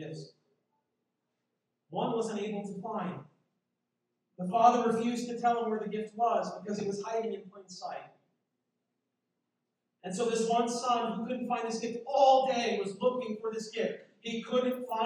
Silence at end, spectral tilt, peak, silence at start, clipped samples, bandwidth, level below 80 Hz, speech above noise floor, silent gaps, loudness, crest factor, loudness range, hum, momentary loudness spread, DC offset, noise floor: 0 s; -5 dB/octave; -10 dBFS; 0 s; under 0.1%; 13.5 kHz; -86 dBFS; 53 dB; none; -31 LUFS; 22 dB; 9 LU; none; 17 LU; under 0.1%; -84 dBFS